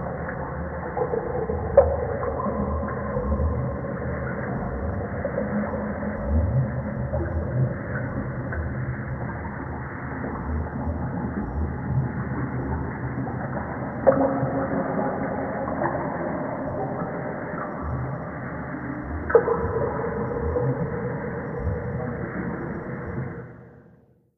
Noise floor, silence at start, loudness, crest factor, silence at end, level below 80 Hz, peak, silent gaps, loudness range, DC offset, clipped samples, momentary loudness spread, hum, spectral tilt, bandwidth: -56 dBFS; 0 s; -27 LUFS; 24 dB; 0.5 s; -36 dBFS; -2 dBFS; none; 5 LU; under 0.1%; under 0.1%; 9 LU; none; -12.5 dB/octave; 2.5 kHz